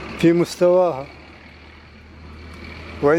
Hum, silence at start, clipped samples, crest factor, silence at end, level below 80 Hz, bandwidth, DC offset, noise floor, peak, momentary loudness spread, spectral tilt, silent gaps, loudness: none; 0 s; under 0.1%; 16 dB; 0 s; -46 dBFS; 15 kHz; under 0.1%; -43 dBFS; -4 dBFS; 24 LU; -6.5 dB/octave; none; -18 LUFS